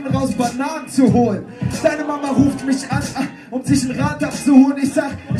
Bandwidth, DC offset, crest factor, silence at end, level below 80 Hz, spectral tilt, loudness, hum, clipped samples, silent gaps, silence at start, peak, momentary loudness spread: 13 kHz; under 0.1%; 16 dB; 0 s; -44 dBFS; -6 dB/octave; -18 LUFS; none; under 0.1%; none; 0 s; 0 dBFS; 11 LU